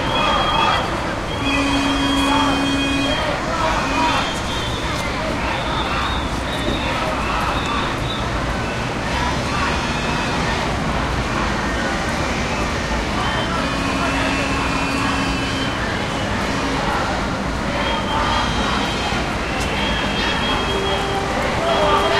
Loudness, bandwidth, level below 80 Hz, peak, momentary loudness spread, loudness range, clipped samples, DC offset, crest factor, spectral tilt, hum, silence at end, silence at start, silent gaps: -20 LUFS; 14.5 kHz; -30 dBFS; -4 dBFS; 5 LU; 3 LU; under 0.1%; under 0.1%; 16 dB; -4.5 dB/octave; none; 0 s; 0 s; none